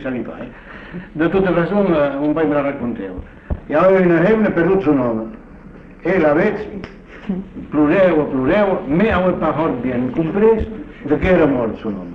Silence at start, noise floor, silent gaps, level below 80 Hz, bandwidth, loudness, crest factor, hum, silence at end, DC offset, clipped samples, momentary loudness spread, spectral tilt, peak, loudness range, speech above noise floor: 0 s; -38 dBFS; none; -36 dBFS; 6.2 kHz; -16 LUFS; 14 dB; none; 0 s; under 0.1%; under 0.1%; 17 LU; -9.5 dB/octave; -2 dBFS; 3 LU; 22 dB